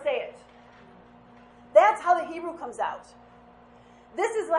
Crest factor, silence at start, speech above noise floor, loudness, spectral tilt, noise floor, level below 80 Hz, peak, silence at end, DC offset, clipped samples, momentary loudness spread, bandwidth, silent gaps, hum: 22 dB; 0 s; 24 dB; -25 LUFS; -3.5 dB/octave; -53 dBFS; -66 dBFS; -4 dBFS; 0 s; under 0.1%; under 0.1%; 20 LU; 11 kHz; none; none